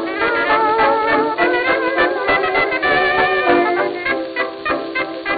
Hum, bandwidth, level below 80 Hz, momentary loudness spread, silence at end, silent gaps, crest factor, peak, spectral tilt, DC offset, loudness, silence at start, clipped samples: none; 5 kHz; -48 dBFS; 6 LU; 0 s; none; 16 dB; -2 dBFS; -7.5 dB/octave; under 0.1%; -16 LUFS; 0 s; under 0.1%